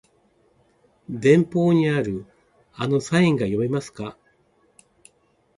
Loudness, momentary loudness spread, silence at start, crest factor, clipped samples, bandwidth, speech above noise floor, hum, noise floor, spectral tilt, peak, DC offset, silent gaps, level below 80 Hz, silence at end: -21 LUFS; 17 LU; 1.1 s; 20 dB; under 0.1%; 11.5 kHz; 43 dB; none; -63 dBFS; -7 dB/octave; -4 dBFS; under 0.1%; none; -58 dBFS; 1.45 s